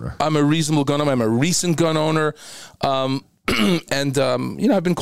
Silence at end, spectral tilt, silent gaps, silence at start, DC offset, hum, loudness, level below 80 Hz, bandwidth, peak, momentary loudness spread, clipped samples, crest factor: 0 s; -5 dB/octave; none; 0 s; 0.8%; none; -20 LUFS; -46 dBFS; 16 kHz; -4 dBFS; 7 LU; under 0.1%; 14 dB